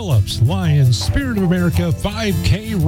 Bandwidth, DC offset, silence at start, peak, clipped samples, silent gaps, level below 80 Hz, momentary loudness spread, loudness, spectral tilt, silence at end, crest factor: 16.5 kHz; under 0.1%; 0 s; -6 dBFS; under 0.1%; none; -30 dBFS; 5 LU; -17 LUFS; -6 dB/octave; 0 s; 10 dB